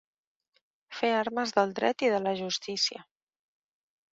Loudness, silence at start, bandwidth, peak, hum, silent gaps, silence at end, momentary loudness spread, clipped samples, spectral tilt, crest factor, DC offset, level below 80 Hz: -29 LUFS; 0.9 s; 8 kHz; -10 dBFS; none; none; 1.1 s; 5 LU; under 0.1%; -3 dB/octave; 22 dB; under 0.1%; -76 dBFS